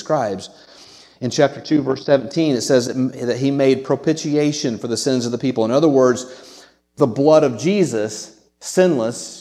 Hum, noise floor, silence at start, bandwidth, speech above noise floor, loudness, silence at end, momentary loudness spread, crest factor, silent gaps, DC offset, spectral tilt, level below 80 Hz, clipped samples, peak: none; -45 dBFS; 0 s; 14 kHz; 27 dB; -18 LUFS; 0 s; 11 LU; 18 dB; none; under 0.1%; -5.5 dB/octave; -64 dBFS; under 0.1%; 0 dBFS